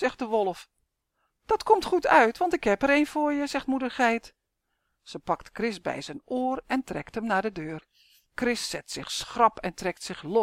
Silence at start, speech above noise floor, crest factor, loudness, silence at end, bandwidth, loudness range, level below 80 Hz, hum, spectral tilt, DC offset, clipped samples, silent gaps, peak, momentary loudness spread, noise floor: 0 s; 52 dB; 22 dB; -27 LUFS; 0 s; 16 kHz; 7 LU; -56 dBFS; none; -4 dB/octave; under 0.1%; under 0.1%; none; -6 dBFS; 13 LU; -79 dBFS